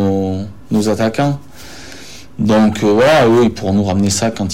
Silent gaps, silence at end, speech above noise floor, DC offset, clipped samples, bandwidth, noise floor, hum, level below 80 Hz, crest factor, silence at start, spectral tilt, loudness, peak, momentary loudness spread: none; 0 s; 23 dB; 2%; under 0.1%; 16 kHz; -35 dBFS; none; -42 dBFS; 10 dB; 0 s; -5.5 dB/octave; -14 LUFS; -4 dBFS; 22 LU